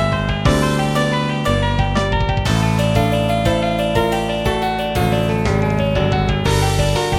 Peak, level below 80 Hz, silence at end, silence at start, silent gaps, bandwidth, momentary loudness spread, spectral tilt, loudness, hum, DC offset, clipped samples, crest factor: -2 dBFS; -26 dBFS; 0 s; 0 s; none; 16.5 kHz; 2 LU; -5.5 dB/octave; -17 LUFS; none; under 0.1%; under 0.1%; 14 dB